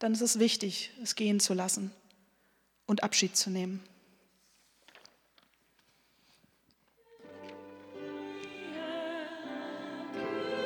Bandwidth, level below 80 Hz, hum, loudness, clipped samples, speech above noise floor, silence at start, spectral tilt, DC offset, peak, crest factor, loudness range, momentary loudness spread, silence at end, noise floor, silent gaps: 19 kHz; -84 dBFS; none; -32 LUFS; under 0.1%; 40 dB; 0 s; -3 dB/octave; under 0.1%; -14 dBFS; 22 dB; 19 LU; 21 LU; 0 s; -71 dBFS; none